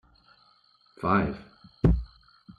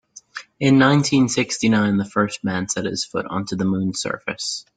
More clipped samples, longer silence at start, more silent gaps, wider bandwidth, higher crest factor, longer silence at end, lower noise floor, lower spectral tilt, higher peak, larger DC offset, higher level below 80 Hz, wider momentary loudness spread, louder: neither; first, 1 s vs 0.15 s; neither; second, 5.2 kHz vs 9.4 kHz; about the same, 22 dB vs 18 dB; about the same, 0.05 s vs 0.15 s; first, -63 dBFS vs -39 dBFS; first, -9.5 dB/octave vs -4.5 dB/octave; second, -8 dBFS vs -2 dBFS; neither; first, -36 dBFS vs -56 dBFS; first, 16 LU vs 11 LU; second, -27 LUFS vs -20 LUFS